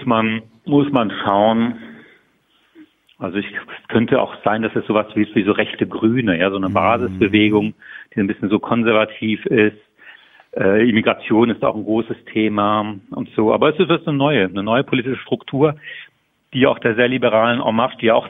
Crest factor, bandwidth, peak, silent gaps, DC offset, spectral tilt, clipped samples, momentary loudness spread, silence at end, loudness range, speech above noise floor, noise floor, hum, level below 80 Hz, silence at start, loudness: 16 dB; 3.9 kHz; -2 dBFS; none; under 0.1%; -9 dB/octave; under 0.1%; 10 LU; 0 s; 4 LU; 43 dB; -60 dBFS; none; -56 dBFS; 0 s; -17 LUFS